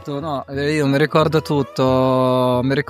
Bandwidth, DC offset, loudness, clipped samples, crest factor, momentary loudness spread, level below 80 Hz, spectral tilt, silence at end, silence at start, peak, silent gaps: 15.5 kHz; under 0.1%; -18 LUFS; under 0.1%; 16 dB; 8 LU; -54 dBFS; -7 dB/octave; 0.05 s; 0 s; -2 dBFS; none